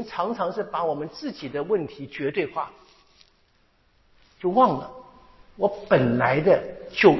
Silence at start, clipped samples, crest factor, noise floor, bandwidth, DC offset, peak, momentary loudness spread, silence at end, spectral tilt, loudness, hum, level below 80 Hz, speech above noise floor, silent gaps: 0 s; under 0.1%; 24 dB; -63 dBFS; 6 kHz; under 0.1%; -2 dBFS; 13 LU; 0 s; -7.5 dB/octave; -24 LUFS; none; -58 dBFS; 40 dB; none